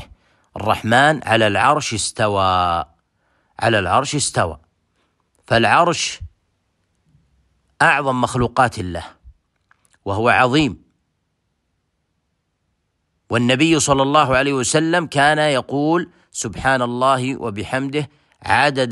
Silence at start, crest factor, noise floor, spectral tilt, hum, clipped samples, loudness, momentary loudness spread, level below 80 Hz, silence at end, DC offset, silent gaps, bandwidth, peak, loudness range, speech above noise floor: 0 s; 18 dB; -70 dBFS; -4 dB/octave; none; under 0.1%; -17 LUFS; 12 LU; -46 dBFS; 0 s; under 0.1%; none; 12.5 kHz; -2 dBFS; 5 LU; 54 dB